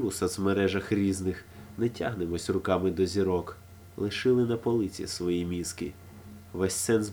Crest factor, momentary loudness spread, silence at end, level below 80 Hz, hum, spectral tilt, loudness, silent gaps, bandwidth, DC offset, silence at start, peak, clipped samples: 18 dB; 16 LU; 0 s; -54 dBFS; none; -5.5 dB/octave; -29 LUFS; none; over 20 kHz; under 0.1%; 0 s; -10 dBFS; under 0.1%